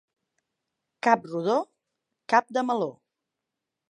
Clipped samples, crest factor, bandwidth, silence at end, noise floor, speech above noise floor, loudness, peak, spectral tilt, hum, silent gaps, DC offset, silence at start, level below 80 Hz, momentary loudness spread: under 0.1%; 24 dB; 10.5 kHz; 1 s; -86 dBFS; 62 dB; -26 LUFS; -4 dBFS; -5 dB/octave; none; none; under 0.1%; 1.05 s; -84 dBFS; 7 LU